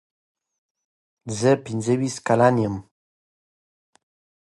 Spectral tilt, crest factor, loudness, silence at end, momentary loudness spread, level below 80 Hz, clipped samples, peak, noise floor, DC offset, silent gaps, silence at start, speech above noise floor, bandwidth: -6 dB/octave; 20 dB; -21 LUFS; 1.65 s; 15 LU; -58 dBFS; under 0.1%; -4 dBFS; under -90 dBFS; under 0.1%; none; 1.25 s; over 69 dB; 11.5 kHz